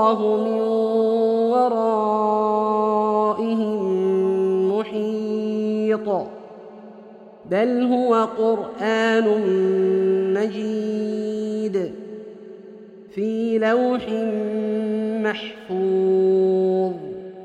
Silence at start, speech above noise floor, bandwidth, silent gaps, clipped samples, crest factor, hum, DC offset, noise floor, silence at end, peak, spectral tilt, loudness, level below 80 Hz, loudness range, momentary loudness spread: 0 s; 23 dB; 8.4 kHz; none; under 0.1%; 16 dB; none; under 0.1%; -43 dBFS; 0 s; -4 dBFS; -7 dB/octave; -21 LUFS; -66 dBFS; 5 LU; 11 LU